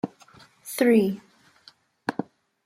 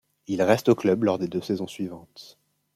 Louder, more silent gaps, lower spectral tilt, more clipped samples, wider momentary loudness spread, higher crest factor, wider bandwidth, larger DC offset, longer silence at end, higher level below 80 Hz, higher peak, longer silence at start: about the same, -25 LUFS vs -25 LUFS; neither; about the same, -5.5 dB/octave vs -6.5 dB/octave; neither; first, 22 LU vs 14 LU; about the same, 20 dB vs 22 dB; about the same, 15.5 kHz vs 15.5 kHz; neither; about the same, 0.45 s vs 0.5 s; about the same, -72 dBFS vs -68 dBFS; second, -8 dBFS vs -4 dBFS; second, 0.05 s vs 0.3 s